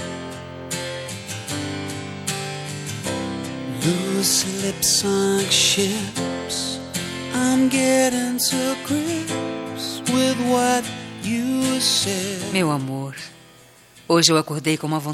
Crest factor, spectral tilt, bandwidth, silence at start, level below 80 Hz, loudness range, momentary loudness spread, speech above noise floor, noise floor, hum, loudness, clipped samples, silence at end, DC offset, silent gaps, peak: 22 dB; -3 dB/octave; 16.5 kHz; 0 s; -58 dBFS; 7 LU; 12 LU; 28 dB; -49 dBFS; none; -21 LUFS; under 0.1%; 0 s; under 0.1%; none; 0 dBFS